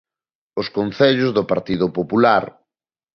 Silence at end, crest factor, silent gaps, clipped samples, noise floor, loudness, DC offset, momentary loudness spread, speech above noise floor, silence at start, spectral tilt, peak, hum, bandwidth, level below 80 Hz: 0.65 s; 18 dB; none; under 0.1%; under -90 dBFS; -18 LUFS; under 0.1%; 11 LU; over 72 dB; 0.55 s; -7.5 dB/octave; -2 dBFS; none; 6.4 kHz; -54 dBFS